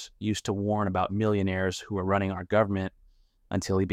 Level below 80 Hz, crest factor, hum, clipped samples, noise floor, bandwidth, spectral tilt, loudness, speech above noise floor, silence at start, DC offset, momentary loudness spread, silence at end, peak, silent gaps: -56 dBFS; 16 dB; none; under 0.1%; -61 dBFS; 14 kHz; -6 dB/octave; -28 LUFS; 33 dB; 0 s; under 0.1%; 7 LU; 0 s; -12 dBFS; none